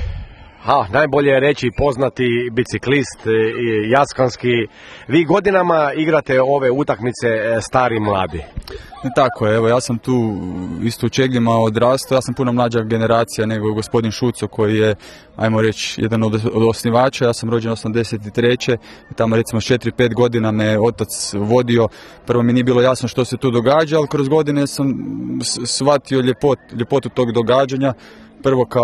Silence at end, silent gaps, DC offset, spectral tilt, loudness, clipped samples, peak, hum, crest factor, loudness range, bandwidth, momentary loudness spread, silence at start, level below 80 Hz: 0 s; none; under 0.1%; -5.5 dB/octave; -17 LUFS; under 0.1%; 0 dBFS; none; 16 dB; 2 LU; 13.5 kHz; 7 LU; 0 s; -42 dBFS